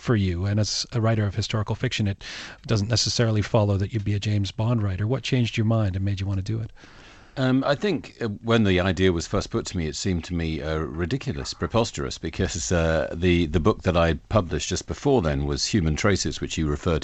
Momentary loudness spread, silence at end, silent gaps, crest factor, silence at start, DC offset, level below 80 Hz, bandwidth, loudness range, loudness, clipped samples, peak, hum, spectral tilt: 7 LU; 0 s; none; 18 dB; 0 s; under 0.1%; -38 dBFS; 8.6 kHz; 3 LU; -24 LUFS; under 0.1%; -6 dBFS; none; -5.5 dB/octave